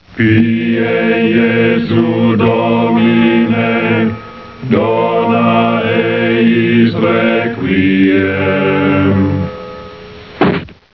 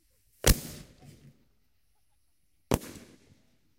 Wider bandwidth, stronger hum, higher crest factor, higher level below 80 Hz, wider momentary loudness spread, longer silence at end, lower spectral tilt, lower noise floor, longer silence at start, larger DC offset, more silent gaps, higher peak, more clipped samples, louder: second, 5.4 kHz vs 16 kHz; neither; second, 12 dB vs 30 dB; second, -46 dBFS vs -38 dBFS; second, 9 LU vs 24 LU; second, 0.2 s vs 0.8 s; first, -9.5 dB/octave vs -3.5 dB/octave; second, -32 dBFS vs -75 dBFS; second, 0.1 s vs 0.45 s; first, 0.3% vs under 0.1%; neither; first, 0 dBFS vs -4 dBFS; neither; first, -12 LUFS vs -29 LUFS